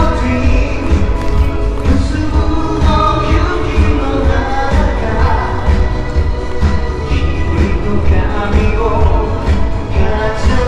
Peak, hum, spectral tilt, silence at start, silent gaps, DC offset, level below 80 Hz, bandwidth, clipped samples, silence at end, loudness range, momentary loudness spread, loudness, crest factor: 0 dBFS; none; -7 dB/octave; 0 s; none; under 0.1%; -14 dBFS; 9.4 kHz; under 0.1%; 0 s; 2 LU; 3 LU; -15 LUFS; 12 dB